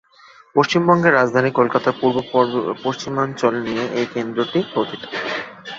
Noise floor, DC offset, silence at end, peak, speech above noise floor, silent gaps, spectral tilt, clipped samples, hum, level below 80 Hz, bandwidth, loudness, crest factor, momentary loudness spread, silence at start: -48 dBFS; under 0.1%; 0 s; -2 dBFS; 30 dB; none; -6 dB/octave; under 0.1%; none; -60 dBFS; 7.8 kHz; -19 LUFS; 18 dB; 10 LU; 0.55 s